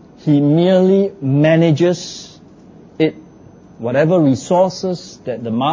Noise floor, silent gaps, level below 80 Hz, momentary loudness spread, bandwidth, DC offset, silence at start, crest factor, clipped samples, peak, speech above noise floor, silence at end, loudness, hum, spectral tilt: -42 dBFS; none; -56 dBFS; 14 LU; 7.6 kHz; under 0.1%; 0.25 s; 14 dB; under 0.1%; -2 dBFS; 28 dB; 0 s; -15 LUFS; none; -7 dB/octave